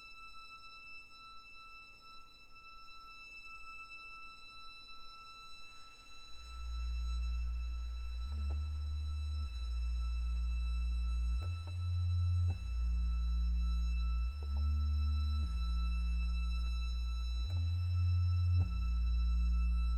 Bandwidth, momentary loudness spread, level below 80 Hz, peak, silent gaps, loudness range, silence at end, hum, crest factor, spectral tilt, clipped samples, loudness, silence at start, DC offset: 8.4 kHz; 18 LU; -38 dBFS; -24 dBFS; none; 15 LU; 0 s; none; 12 dB; -6 dB/octave; under 0.1%; -38 LUFS; 0 s; under 0.1%